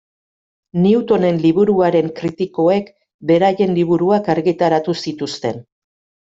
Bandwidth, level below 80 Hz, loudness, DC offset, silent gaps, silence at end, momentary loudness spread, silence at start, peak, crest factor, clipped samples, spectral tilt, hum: 7.8 kHz; -56 dBFS; -16 LUFS; under 0.1%; 3.14-3.19 s; 0.6 s; 10 LU; 0.75 s; -2 dBFS; 14 dB; under 0.1%; -7.5 dB/octave; none